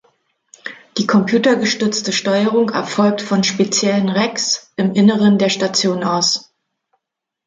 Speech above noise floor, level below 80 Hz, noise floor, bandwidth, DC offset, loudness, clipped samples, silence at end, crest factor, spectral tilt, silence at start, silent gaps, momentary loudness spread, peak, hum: 64 dB; -62 dBFS; -79 dBFS; 9.2 kHz; under 0.1%; -16 LUFS; under 0.1%; 1.05 s; 14 dB; -4 dB/octave; 0.65 s; none; 5 LU; -2 dBFS; none